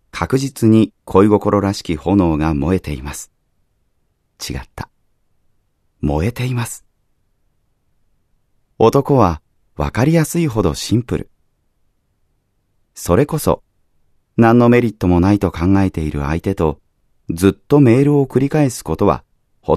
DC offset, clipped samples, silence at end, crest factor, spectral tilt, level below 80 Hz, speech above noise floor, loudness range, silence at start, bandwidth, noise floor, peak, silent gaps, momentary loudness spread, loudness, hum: under 0.1%; under 0.1%; 0 s; 16 dB; -7 dB/octave; -36 dBFS; 49 dB; 10 LU; 0.15 s; 14 kHz; -64 dBFS; 0 dBFS; none; 15 LU; -16 LUFS; none